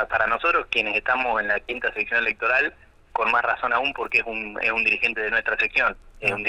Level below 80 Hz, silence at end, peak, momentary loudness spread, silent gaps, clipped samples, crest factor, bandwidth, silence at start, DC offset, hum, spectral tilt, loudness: -50 dBFS; 0 s; -6 dBFS; 5 LU; none; under 0.1%; 16 dB; 13 kHz; 0 s; under 0.1%; none; -4 dB/octave; -22 LUFS